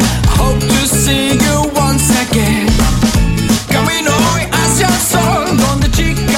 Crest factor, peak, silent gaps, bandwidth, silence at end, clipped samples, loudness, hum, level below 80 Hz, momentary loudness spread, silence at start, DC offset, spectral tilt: 12 dB; 0 dBFS; none; 16.5 kHz; 0 s; under 0.1%; -12 LUFS; none; -20 dBFS; 2 LU; 0 s; under 0.1%; -4 dB/octave